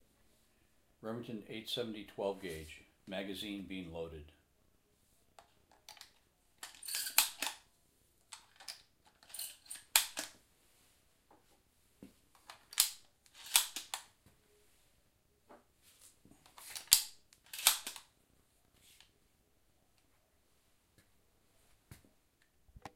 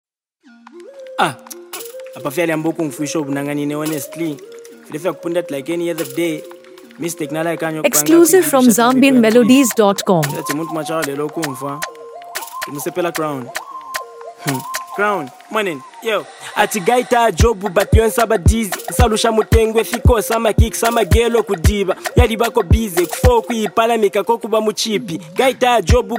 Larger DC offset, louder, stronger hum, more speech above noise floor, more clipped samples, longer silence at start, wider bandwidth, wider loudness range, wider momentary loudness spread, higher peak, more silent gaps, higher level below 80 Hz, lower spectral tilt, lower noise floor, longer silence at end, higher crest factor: neither; second, -36 LUFS vs -16 LUFS; neither; second, 31 dB vs 36 dB; neither; first, 1 s vs 0.75 s; second, 16 kHz vs 19 kHz; about the same, 12 LU vs 10 LU; first, 24 LU vs 16 LU; about the same, -2 dBFS vs 0 dBFS; neither; second, -70 dBFS vs -26 dBFS; second, -0.5 dB/octave vs -5 dB/octave; first, -74 dBFS vs -51 dBFS; about the same, 0.05 s vs 0 s; first, 42 dB vs 16 dB